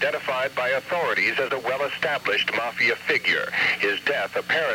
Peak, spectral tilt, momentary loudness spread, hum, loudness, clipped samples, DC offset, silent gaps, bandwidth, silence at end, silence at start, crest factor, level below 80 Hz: -8 dBFS; -3 dB/octave; 4 LU; none; -23 LUFS; under 0.1%; under 0.1%; none; 17 kHz; 0 s; 0 s; 16 dB; -68 dBFS